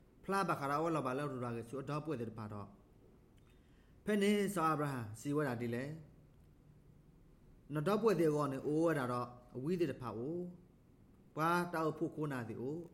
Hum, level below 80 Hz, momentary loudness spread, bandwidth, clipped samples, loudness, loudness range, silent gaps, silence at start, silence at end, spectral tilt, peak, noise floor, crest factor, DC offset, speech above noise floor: none; -68 dBFS; 12 LU; 16 kHz; under 0.1%; -38 LUFS; 5 LU; none; 0.25 s; 0.05 s; -6.5 dB/octave; -20 dBFS; -64 dBFS; 20 dB; under 0.1%; 27 dB